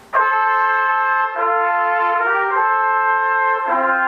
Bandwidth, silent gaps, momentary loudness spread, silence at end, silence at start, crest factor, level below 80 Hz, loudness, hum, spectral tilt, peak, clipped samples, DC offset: 6 kHz; none; 2 LU; 0 s; 0.1 s; 12 dB; -68 dBFS; -16 LUFS; none; -3.5 dB/octave; -4 dBFS; under 0.1%; under 0.1%